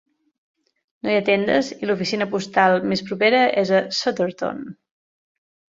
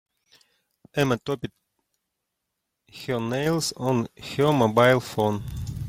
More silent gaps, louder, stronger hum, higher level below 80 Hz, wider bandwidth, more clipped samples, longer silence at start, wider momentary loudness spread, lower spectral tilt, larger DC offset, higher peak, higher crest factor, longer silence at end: neither; first, -20 LUFS vs -24 LUFS; neither; second, -64 dBFS vs -50 dBFS; second, 7.8 kHz vs 16.5 kHz; neither; about the same, 1.05 s vs 0.95 s; about the same, 11 LU vs 13 LU; about the same, -5 dB/octave vs -5.5 dB/octave; neither; about the same, -2 dBFS vs -4 dBFS; about the same, 20 dB vs 22 dB; first, 1 s vs 0 s